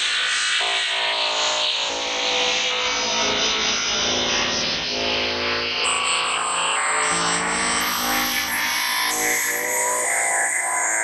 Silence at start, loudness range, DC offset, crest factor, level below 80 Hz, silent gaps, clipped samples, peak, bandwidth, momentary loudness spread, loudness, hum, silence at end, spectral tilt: 0 s; 1 LU; under 0.1%; 14 dB; -52 dBFS; none; under 0.1%; -8 dBFS; 16 kHz; 2 LU; -20 LUFS; none; 0 s; 0 dB/octave